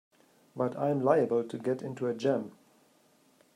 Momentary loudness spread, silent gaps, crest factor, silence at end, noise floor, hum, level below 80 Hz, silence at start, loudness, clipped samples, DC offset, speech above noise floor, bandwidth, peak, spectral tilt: 8 LU; none; 20 dB; 1.05 s; -65 dBFS; none; -80 dBFS; 0.55 s; -30 LUFS; under 0.1%; under 0.1%; 36 dB; 12.5 kHz; -12 dBFS; -7.5 dB/octave